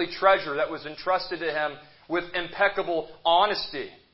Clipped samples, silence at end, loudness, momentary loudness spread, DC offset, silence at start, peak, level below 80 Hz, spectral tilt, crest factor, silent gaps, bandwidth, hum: under 0.1%; 0.2 s; -26 LUFS; 11 LU; under 0.1%; 0 s; -6 dBFS; -60 dBFS; -7.5 dB/octave; 20 dB; none; 5.8 kHz; none